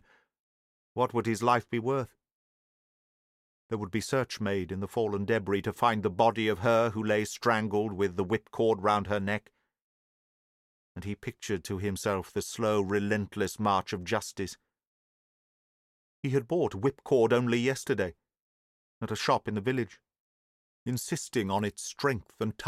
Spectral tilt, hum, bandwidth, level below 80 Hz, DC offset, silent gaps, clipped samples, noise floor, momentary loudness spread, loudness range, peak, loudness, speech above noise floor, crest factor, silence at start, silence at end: -5.5 dB/octave; none; 15 kHz; -64 dBFS; under 0.1%; 2.32-3.69 s, 9.81-10.95 s, 14.87-16.23 s, 18.40-19.01 s, 20.20-20.86 s; under 0.1%; under -90 dBFS; 11 LU; 6 LU; -10 dBFS; -30 LUFS; over 61 dB; 20 dB; 0.95 s; 0 s